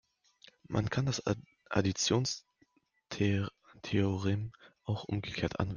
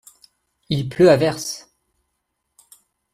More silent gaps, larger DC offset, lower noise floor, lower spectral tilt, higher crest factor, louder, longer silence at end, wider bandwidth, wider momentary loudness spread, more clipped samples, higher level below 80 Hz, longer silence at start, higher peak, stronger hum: neither; neither; second, -71 dBFS vs -75 dBFS; about the same, -5 dB/octave vs -5.5 dB/octave; about the same, 20 dB vs 20 dB; second, -34 LUFS vs -18 LUFS; second, 0 s vs 1.55 s; second, 10 kHz vs 15 kHz; second, 12 LU vs 15 LU; neither; about the same, -60 dBFS vs -56 dBFS; about the same, 0.7 s vs 0.7 s; second, -14 dBFS vs -2 dBFS; neither